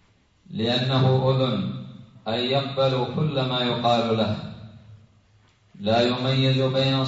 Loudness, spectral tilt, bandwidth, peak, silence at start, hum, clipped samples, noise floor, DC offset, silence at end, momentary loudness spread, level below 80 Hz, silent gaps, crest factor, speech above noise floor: -23 LUFS; -7 dB/octave; 7.8 kHz; -8 dBFS; 0.5 s; none; under 0.1%; -59 dBFS; under 0.1%; 0 s; 14 LU; -58 dBFS; none; 16 dB; 37 dB